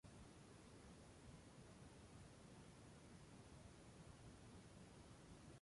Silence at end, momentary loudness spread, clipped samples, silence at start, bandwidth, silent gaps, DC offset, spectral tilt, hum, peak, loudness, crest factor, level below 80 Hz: 0 s; 1 LU; under 0.1%; 0.05 s; 11.5 kHz; none; under 0.1%; -5 dB/octave; none; -50 dBFS; -64 LUFS; 14 dB; -72 dBFS